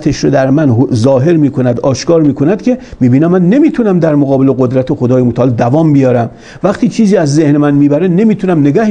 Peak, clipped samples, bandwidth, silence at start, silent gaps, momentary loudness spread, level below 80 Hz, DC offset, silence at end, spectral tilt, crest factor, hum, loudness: 0 dBFS; 0.2%; 9.4 kHz; 0 s; none; 4 LU; -40 dBFS; under 0.1%; 0 s; -8 dB/octave; 8 dB; none; -9 LUFS